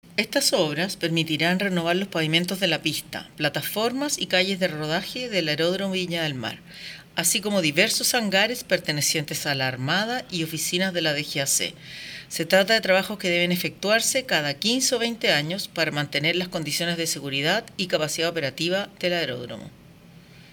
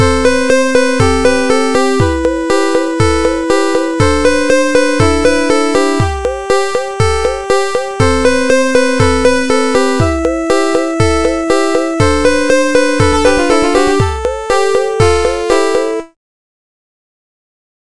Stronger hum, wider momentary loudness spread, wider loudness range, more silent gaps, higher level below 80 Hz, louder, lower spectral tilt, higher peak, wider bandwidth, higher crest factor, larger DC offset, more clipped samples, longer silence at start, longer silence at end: neither; first, 8 LU vs 4 LU; about the same, 3 LU vs 2 LU; neither; second, -62 dBFS vs -28 dBFS; second, -23 LUFS vs -12 LUFS; second, -3 dB/octave vs -5 dB/octave; second, -6 dBFS vs 0 dBFS; first, over 20 kHz vs 11.5 kHz; first, 20 dB vs 12 dB; second, under 0.1% vs 6%; neither; about the same, 0.05 s vs 0 s; second, 0.1 s vs 1.8 s